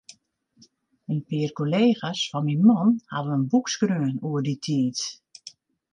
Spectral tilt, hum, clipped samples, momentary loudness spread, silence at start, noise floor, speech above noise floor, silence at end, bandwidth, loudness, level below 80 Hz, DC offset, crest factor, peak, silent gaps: -6 dB/octave; none; under 0.1%; 16 LU; 1.1 s; -62 dBFS; 39 dB; 0.45 s; 10 kHz; -24 LUFS; -72 dBFS; under 0.1%; 18 dB; -6 dBFS; none